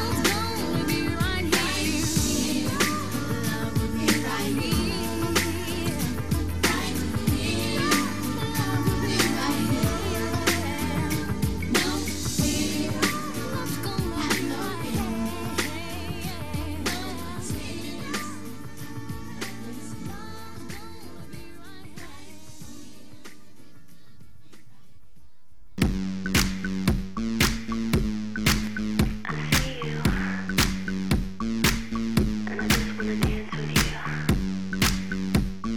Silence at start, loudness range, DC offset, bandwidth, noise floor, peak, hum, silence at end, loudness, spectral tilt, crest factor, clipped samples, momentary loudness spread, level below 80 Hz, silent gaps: 0 s; 13 LU; 1%; 19 kHz; -59 dBFS; -6 dBFS; none; 0 s; -26 LUFS; -4 dB/octave; 20 dB; under 0.1%; 15 LU; -38 dBFS; none